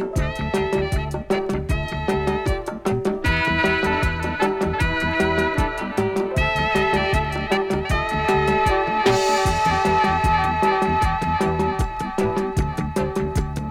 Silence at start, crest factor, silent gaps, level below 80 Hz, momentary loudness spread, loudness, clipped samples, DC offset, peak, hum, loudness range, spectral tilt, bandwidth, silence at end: 0 s; 16 dB; none; -30 dBFS; 6 LU; -21 LUFS; under 0.1%; under 0.1%; -6 dBFS; none; 3 LU; -5.5 dB/octave; 16.5 kHz; 0 s